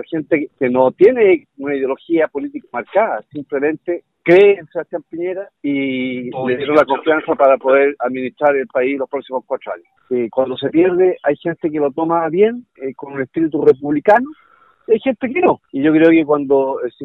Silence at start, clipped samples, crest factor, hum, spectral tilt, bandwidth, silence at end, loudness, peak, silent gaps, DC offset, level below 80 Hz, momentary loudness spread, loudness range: 0 s; under 0.1%; 14 dB; none; -8 dB/octave; 5 kHz; 0 s; -16 LUFS; 0 dBFS; none; under 0.1%; -60 dBFS; 13 LU; 3 LU